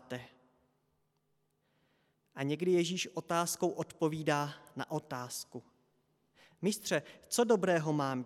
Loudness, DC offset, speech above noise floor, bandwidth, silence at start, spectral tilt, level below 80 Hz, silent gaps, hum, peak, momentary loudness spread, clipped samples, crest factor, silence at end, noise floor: -34 LUFS; under 0.1%; 45 dB; 16 kHz; 0.1 s; -4.5 dB/octave; -80 dBFS; none; none; -16 dBFS; 14 LU; under 0.1%; 20 dB; 0 s; -78 dBFS